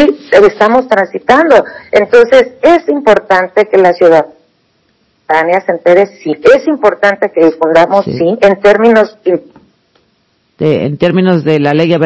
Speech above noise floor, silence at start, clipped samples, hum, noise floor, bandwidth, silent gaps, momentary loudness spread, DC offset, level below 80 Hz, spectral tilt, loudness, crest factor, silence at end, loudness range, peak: 48 dB; 0 s; 6%; none; -56 dBFS; 8 kHz; none; 6 LU; under 0.1%; -46 dBFS; -6.5 dB/octave; -8 LUFS; 8 dB; 0 s; 3 LU; 0 dBFS